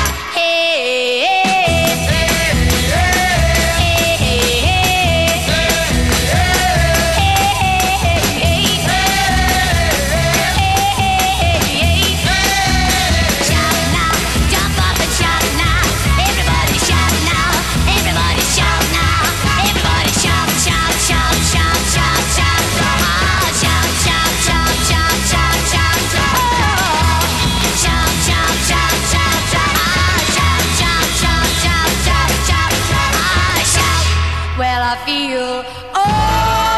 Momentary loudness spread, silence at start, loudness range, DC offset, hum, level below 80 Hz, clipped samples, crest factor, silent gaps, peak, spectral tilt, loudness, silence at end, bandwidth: 2 LU; 0 s; 1 LU; 0.6%; none; -22 dBFS; under 0.1%; 14 dB; none; 0 dBFS; -3 dB/octave; -13 LUFS; 0 s; 14 kHz